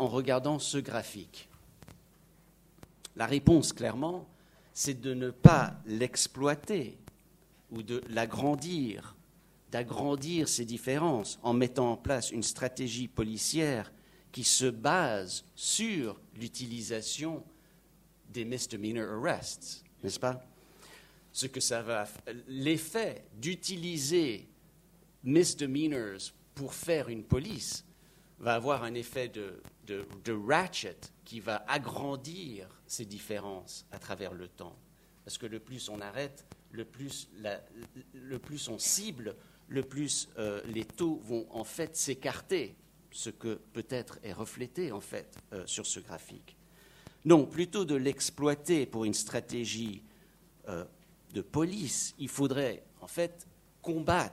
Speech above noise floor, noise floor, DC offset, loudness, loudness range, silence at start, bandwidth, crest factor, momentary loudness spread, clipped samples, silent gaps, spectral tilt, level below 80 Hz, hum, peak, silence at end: 30 dB; -63 dBFS; under 0.1%; -33 LUFS; 11 LU; 0 s; 16 kHz; 32 dB; 15 LU; under 0.1%; none; -4.5 dB/octave; -56 dBFS; none; -2 dBFS; 0 s